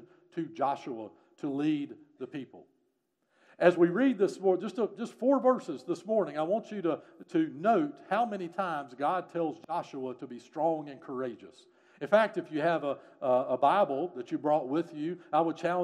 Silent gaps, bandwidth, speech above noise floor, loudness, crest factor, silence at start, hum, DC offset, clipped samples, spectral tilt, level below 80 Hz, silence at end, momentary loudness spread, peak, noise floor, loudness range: none; 11 kHz; 47 dB; -31 LUFS; 22 dB; 0 s; none; under 0.1%; under 0.1%; -7 dB/octave; -88 dBFS; 0 s; 15 LU; -8 dBFS; -77 dBFS; 6 LU